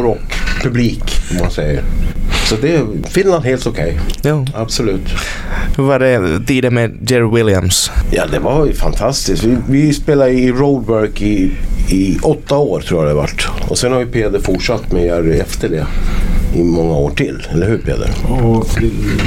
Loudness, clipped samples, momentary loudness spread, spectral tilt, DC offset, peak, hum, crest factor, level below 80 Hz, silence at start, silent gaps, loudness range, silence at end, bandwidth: -14 LUFS; under 0.1%; 7 LU; -5.5 dB/octave; under 0.1%; 0 dBFS; none; 12 dB; -18 dBFS; 0 s; none; 3 LU; 0 s; 16 kHz